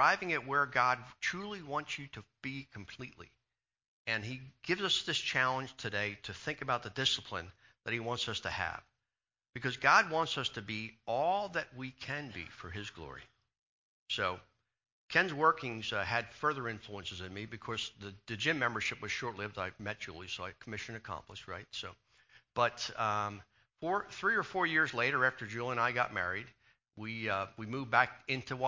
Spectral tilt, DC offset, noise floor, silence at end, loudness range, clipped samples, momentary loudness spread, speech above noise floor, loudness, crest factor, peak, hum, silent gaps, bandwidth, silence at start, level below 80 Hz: -3.5 dB/octave; under 0.1%; under -90 dBFS; 0 s; 7 LU; under 0.1%; 15 LU; over 54 dB; -35 LUFS; 24 dB; -12 dBFS; none; 3.88-4.05 s, 13.62-14.06 s, 14.92-15.08 s; 7.6 kHz; 0 s; -64 dBFS